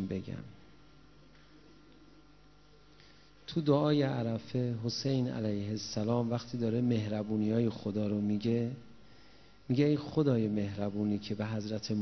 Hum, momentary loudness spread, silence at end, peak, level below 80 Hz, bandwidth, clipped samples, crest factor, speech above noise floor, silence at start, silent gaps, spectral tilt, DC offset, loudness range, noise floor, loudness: 50 Hz at -60 dBFS; 8 LU; 0 s; -14 dBFS; -62 dBFS; 6.4 kHz; under 0.1%; 20 dB; 29 dB; 0 s; none; -7 dB/octave; under 0.1%; 3 LU; -61 dBFS; -33 LUFS